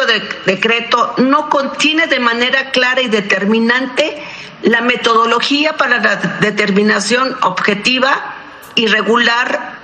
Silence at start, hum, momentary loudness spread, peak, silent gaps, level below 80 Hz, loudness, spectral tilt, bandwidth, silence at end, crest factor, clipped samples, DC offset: 0 s; none; 6 LU; 0 dBFS; none; -58 dBFS; -12 LUFS; -3.5 dB/octave; 14.5 kHz; 0 s; 14 dB; under 0.1%; under 0.1%